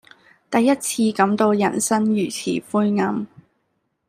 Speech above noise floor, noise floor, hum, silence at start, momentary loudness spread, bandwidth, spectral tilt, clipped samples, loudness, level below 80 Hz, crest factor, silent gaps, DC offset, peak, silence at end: 52 dB; -71 dBFS; none; 0.5 s; 6 LU; 15.5 kHz; -4.5 dB/octave; under 0.1%; -20 LUFS; -66 dBFS; 18 dB; none; under 0.1%; -4 dBFS; 0.8 s